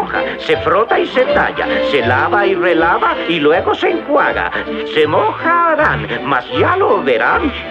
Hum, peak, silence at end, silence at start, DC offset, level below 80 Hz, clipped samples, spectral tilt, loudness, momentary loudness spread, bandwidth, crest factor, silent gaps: none; 0 dBFS; 0 s; 0 s; under 0.1%; -40 dBFS; under 0.1%; -6.5 dB/octave; -13 LUFS; 5 LU; 8.4 kHz; 12 dB; none